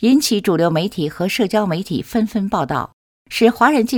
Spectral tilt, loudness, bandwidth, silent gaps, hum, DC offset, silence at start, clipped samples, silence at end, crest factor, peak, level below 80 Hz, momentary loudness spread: -5 dB/octave; -18 LUFS; 19 kHz; 2.93-3.25 s; none; under 0.1%; 0 s; under 0.1%; 0 s; 16 dB; 0 dBFS; -50 dBFS; 8 LU